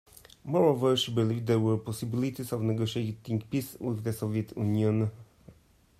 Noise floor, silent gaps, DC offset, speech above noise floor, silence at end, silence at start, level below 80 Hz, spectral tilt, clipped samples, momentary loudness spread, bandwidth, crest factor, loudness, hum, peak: -60 dBFS; none; under 0.1%; 31 dB; 0.5 s; 0.45 s; -64 dBFS; -6.5 dB/octave; under 0.1%; 9 LU; 15.5 kHz; 18 dB; -29 LUFS; none; -12 dBFS